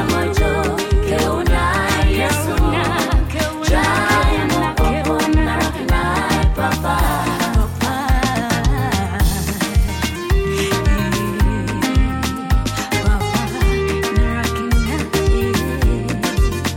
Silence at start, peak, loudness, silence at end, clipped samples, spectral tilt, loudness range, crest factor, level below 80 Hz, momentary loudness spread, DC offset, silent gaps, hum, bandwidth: 0 s; -6 dBFS; -18 LUFS; 0 s; under 0.1%; -5 dB/octave; 2 LU; 10 dB; -20 dBFS; 3 LU; under 0.1%; none; none; 17.5 kHz